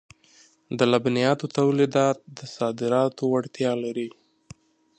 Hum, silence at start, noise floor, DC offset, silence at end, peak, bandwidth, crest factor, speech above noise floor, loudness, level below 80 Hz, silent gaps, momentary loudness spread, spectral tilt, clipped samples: none; 0.7 s; -57 dBFS; under 0.1%; 0.9 s; -4 dBFS; 9.4 kHz; 20 dB; 34 dB; -24 LUFS; -68 dBFS; none; 12 LU; -6 dB/octave; under 0.1%